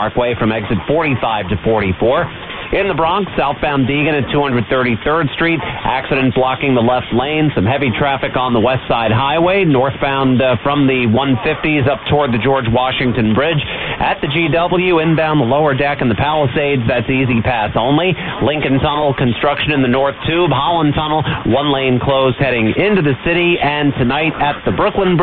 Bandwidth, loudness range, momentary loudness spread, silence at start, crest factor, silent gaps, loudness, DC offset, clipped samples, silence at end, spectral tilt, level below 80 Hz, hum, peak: 4.5 kHz; 2 LU; 3 LU; 0 s; 12 dB; none; -14 LUFS; under 0.1%; under 0.1%; 0 s; -10 dB/octave; -34 dBFS; none; -2 dBFS